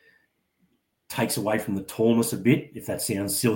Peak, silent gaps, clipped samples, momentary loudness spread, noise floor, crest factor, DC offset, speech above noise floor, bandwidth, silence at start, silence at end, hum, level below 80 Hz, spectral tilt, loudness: -8 dBFS; none; under 0.1%; 9 LU; -70 dBFS; 18 dB; under 0.1%; 45 dB; 17 kHz; 1.1 s; 0 s; none; -62 dBFS; -5 dB/octave; -25 LUFS